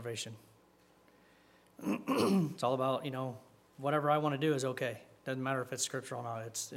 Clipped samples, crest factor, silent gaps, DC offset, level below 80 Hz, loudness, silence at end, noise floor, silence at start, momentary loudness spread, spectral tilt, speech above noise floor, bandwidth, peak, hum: under 0.1%; 20 dB; none; under 0.1%; -80 dBFS; -35 LUFS; 0 s; -66 dBFS; 0 s; 12 LU; -5 dB/octave; 31 dB; 16 kHz; -16 dBFS; none